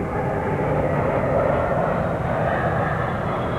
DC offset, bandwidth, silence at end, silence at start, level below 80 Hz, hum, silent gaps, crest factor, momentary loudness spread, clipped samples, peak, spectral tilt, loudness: under 0.1%; 13 kHz; 0 s; 0 s; -38 dBFS; none; none; 14 dB; 3 LU; under 0.1%; -8 dBFS; -8.5 dB/octave; -22 LUFS